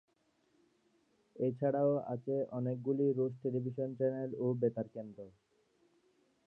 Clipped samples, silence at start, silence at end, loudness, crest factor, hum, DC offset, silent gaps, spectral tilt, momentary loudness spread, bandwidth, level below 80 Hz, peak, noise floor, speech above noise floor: under 0.1%; 1.35 s; 1.15 s; -36 LUFS; 18 dB; none; under 0.1%; none; -11.5 dB/octave; 12 LU; 3.3 kHz; -82 dBFS; -20 dBFS; -75 dBFS; 40 dB